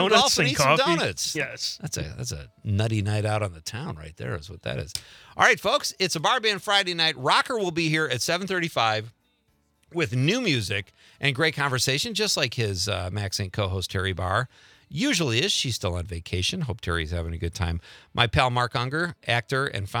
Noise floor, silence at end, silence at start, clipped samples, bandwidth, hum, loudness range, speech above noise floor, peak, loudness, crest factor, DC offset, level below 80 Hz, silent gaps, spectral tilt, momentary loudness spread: -68 dBFS; 0 s; 0 s; under 0.1%; 19 kHz; none; 4 LU; 43 dB; -2 dBFS; -24 LUFS; 24 dB; under 0.1%; -50 dBFS; none; -3.5 dB/octave; 13 LU